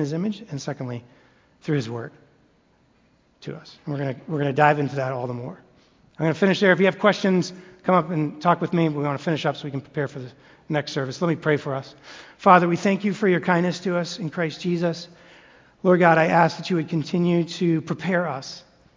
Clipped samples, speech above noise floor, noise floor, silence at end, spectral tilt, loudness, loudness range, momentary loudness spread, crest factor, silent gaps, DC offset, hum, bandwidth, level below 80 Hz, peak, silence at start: under 0.1%; 39 dB; -61 dBFS; 0.35 s; -6.5 dB/octave; -22 LUFS; 9 LU; 19 LU; 22 dB; none; under 0.1%; none; 7.6 kHz; -64 dBFS; 0 dBFS; 0 s